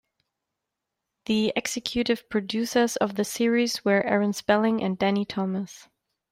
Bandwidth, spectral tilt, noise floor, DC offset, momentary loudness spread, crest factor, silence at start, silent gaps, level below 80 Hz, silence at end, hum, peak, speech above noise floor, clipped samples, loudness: 16 kHz; -4.5 dB/octave; -84 dBFS; under 0.1%; 6 LU; 18 dB; 1.3 s; none; -60 dBFS; 0.5 s; none; -8 dBFS; 60 dB; under 0.1%; -25 LUFS